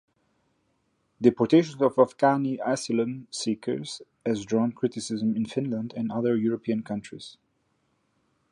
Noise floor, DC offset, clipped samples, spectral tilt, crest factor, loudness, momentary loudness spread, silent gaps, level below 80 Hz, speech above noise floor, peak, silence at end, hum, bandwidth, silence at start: -72 dBFS; under 0.1%; under 0.1%; -6 dB/octave; 22 dB; -26 LUFS; 12 LU; none; -68 dBFS; 46 dB; -6 dBFS; 1.2 s; none; 11 kHz; 1.2 s